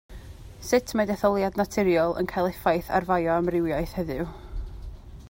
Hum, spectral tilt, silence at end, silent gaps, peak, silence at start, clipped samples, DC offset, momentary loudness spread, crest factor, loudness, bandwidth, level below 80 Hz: none; -6 dB/octave; 0 s; none; -8 dBFS; 0.1 s; under 0.1%; under 0.1%; 20 LU; 18 dB; -25 LUFS; 16.5 kHz; -42 dBFS